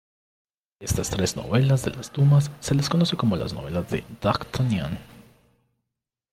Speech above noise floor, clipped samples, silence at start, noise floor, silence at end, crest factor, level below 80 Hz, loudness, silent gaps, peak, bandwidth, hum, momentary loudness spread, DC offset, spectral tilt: 62 dB; under 0.1%; 0.8 s; -85 dBFS; 1.15 s; 16 dB; -46 dBFS; -24 LUFS; none; -8 dBFS; 15.5 kHz; none; 11 LU; under 0.1%; -6 dB/octave